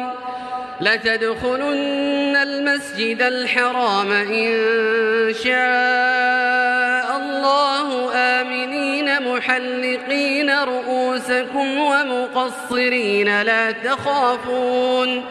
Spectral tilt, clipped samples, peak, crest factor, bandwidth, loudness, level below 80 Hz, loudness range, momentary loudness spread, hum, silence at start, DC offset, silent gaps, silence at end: -3.5 dB/octave; under 0.1%; -2 dBFS; 16 dB; 13 kHz; -18 LUFS; -60 dBFS; 2 LU; 5 LU; none; 0 s; under 0.1%; none; 0 s